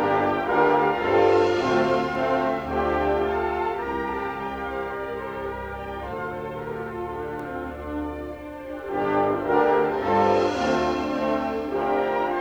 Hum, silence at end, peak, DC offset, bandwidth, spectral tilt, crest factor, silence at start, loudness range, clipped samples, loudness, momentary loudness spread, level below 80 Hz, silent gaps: none; 0 s; -8 dBFS; under 0.1%; over 20 kHz; -6.5 dB/octave; 16 dB; 0 s; 10 LU; under 0.1%; -24 LUFS; 12 LU; -46 dBFS; none